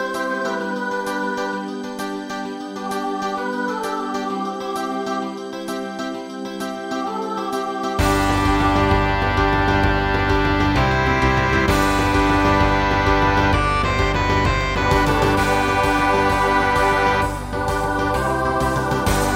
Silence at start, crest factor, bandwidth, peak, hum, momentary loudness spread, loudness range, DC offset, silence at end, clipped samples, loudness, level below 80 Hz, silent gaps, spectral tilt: 0 s; 16 dB; 16 kHz; -4 dBFS; none; 11 LU; 8 LU; under 0.1%; 0 s; under 0.1%; -20 LUFS; -30 dBFS; none; -5.5 dB/octave